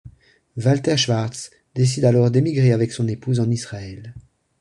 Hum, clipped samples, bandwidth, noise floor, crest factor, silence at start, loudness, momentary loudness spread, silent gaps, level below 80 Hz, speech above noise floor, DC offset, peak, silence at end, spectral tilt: none; under 0.1%; 11 kHz; -51 dBFS; 16 dB; 0.05 s; -19 LUFS; 18 LU; none; -52 dBFS; 32 dB; under 0.1%; -4 dBFS; 0.4 s; -6 dB/octave